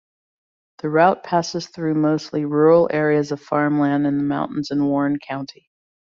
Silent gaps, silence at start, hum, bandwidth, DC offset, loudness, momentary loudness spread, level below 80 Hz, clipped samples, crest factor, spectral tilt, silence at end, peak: none; 0.85 s; none; 7.4 kHz; under 0.1%; -19 LUFS; 11 LU; -62 dBFS; under 0.1%; 18 dB; -6.5 dB/octave; 0.6 s; -2 dBFS